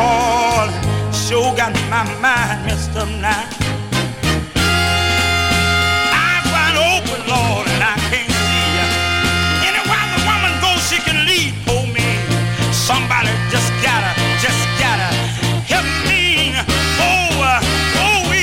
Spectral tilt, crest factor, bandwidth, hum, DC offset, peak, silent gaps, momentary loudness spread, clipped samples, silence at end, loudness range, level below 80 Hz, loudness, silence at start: -3.5 dB/octave; 12 dB; 16.5 kHz; none; under 0.1%; -4 dBFS; none; 5 LU; under 0.1%; 0 s; 3 LU; -30 dBFS; -15 LUFS; 0 s